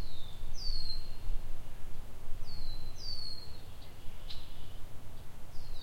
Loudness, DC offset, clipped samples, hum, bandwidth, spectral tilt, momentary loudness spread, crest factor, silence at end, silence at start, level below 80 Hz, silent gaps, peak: -46 LUFS; under 0.1%; under 0.1%; none; 6.6 kHz; -4 dB/octave; 12 LU; 12 dB; 0 s; 0 s; -38 dBFS; none; -18 dBFS